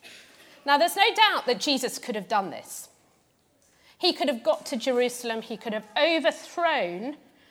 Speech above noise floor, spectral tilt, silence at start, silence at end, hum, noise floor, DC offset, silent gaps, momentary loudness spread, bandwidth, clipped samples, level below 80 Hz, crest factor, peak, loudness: 40 dB; -2.5 dB/octave; 0.05 s; 0.35 s; none; -66 dBFS; under 0.1%; none; 14 LU; 18.5 kHz; under 0.1%; -80 dBFS; 24 dB; -4 dBFS; -25 LUFS